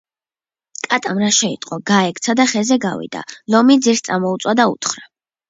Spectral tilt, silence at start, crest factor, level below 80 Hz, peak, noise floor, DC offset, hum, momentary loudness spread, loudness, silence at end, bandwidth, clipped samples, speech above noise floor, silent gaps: -3.5 dB/octave; 0.85 s; 16 dB; -64 dBFS; 0 dBFS; under -90 dBFS; under 0.1%; none; 15 LU; -16 LUFS; 0.45 s; 8 kHz; under 0.1%; over 74 dB; none